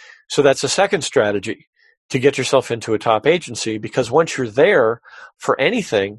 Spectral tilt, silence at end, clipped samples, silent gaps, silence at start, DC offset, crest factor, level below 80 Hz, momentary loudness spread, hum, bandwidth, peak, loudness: -4 dB/octave; 0 s; under 0.1%; 1.67-1.73 s, 1.97-2.09 s; 0.3 s; under 0.1%; 18 dB; -56 dBFS; 9 LU; none; 12 kHz; 0 dBFS; -18 LUFS